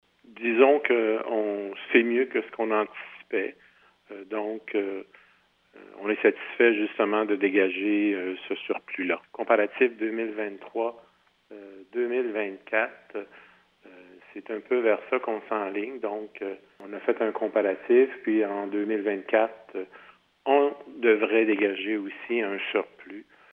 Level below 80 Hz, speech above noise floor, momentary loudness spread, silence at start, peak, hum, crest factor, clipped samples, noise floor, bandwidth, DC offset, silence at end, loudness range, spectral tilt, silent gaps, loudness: -80 dBFS; 37 dB; 16 LU; 0.3 s; -4 dBFS; none; 22 dB; under 0.1%; -63 dBFS; 4 kHz; under 0.1%; 0.3 s; 6 LU; -7.5 dB/octave; none; -26 LUFS